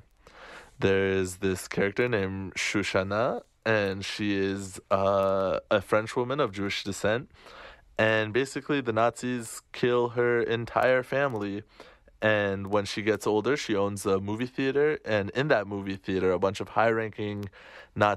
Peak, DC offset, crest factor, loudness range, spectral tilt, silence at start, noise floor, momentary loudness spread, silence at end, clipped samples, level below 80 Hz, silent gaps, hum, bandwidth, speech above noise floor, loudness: -8 dBFS; under 0.1%; 20 dB; 1 LU; -5 dB/octave; 0.35 s; -51 dBFS; 10 LU; 0 s; under 0.1%; -60 dBFS; none; none; 13.5 kHz; 24 dB; -27 LUFS